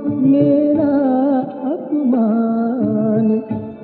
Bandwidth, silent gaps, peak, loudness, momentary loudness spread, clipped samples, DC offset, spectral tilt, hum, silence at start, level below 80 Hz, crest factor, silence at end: 4.3 kHz; none; -4 dBFS; -16 LUFS; 7 LU; under 0.1%; under 0.1%; -14 dB/octave; none; 0 s; -58 dBFS; 12 dB; 0 s